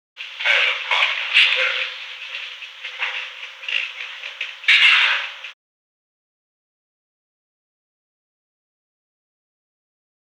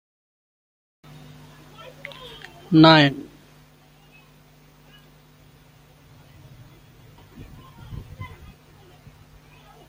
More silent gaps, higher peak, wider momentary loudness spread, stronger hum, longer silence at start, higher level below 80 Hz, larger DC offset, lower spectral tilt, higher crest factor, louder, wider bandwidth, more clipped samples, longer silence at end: neither; second, -4 dBFS vs 0 dBFS; second, 19 LU vs 32 LU; second, none vs 50 Hz at -50 dBFS; second, 0.15 s vs 2.7 s; second, -90 dBFS vs -54 dBFS; neither; second, 5.5 dB/octave vs -6.5 dB/octave; second, 20 dB vs 26 dB; about the same, -17 LUFS vs -15 LUFS; about the same, 16 kHz vs 16 kHz; neither; first, 4.8 s vs 1.6 s